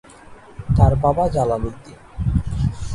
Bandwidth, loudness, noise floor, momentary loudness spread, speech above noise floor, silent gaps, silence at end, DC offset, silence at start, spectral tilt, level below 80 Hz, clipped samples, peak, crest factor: 11.5 kHz; -20 LUFS; -42 dBFS; 20 LU; 25 dB; none; 0 s; under 0.1%; 0.25 s; -8.5 dB/octave; -28 dBFS; under 0.1%; 0 dBFS; 20 dB